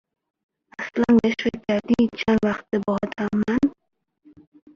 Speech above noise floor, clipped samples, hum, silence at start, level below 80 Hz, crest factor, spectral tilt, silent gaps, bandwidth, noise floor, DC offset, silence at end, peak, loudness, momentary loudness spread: 32 dB; under 0.1%; none; 0.8 s; -52 dBFS; 16 dB; -7 dB/octave; none; 7 kHz; -53 dBFS; under 0.1%; 1.05 s; -6 dBFS; -22 LUFS; 8 LU